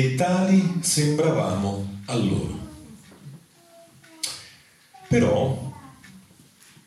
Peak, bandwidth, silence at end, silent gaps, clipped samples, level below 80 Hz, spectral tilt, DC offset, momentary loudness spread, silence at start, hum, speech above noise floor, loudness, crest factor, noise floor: -8 dBFS; 13 kHz; 0.65 s; none; under 0.1%; -54 dBFS; -5.5 dB/octave; under 0.1%; 23 LU; 0 s; none; 31 dB; -23 LUFS; 16 dB; -53 dBFS